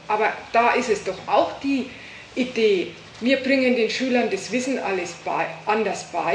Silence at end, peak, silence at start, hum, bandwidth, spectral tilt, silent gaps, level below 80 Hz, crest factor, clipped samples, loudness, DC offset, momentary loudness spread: 0 s; -6 dBFS; 0 s; none; 10 kHz; -4 dB/octave; none; -60 dBFS; 18 dB; under 0.1%; -22 LUFS; under 0.1%; 8 LU